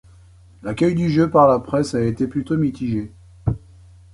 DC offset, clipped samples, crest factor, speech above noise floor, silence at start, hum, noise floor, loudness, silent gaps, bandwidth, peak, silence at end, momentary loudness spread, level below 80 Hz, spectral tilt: under 0.1%; under 0.1%; 18 dB; 29 dB; 0.65 s; none; -47 dBFS; -20 LUFS; none; 11 kHz; -2 dBFS; 0.55 s; 15 LU; -42 dBFS; -8 dB/octave